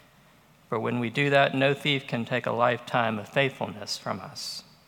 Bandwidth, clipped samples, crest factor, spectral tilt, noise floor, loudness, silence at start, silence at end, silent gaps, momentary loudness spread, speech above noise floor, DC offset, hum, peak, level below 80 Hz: 17.5 kHz; under 0.1%; 22 dB; -5 dB/octave; -58 dBFS; -27 LUFS; 0.7 s; 0.25 s; none; 13 LU; 31 dB; under 0.1%; none; -6 dBFS; -72 dBFS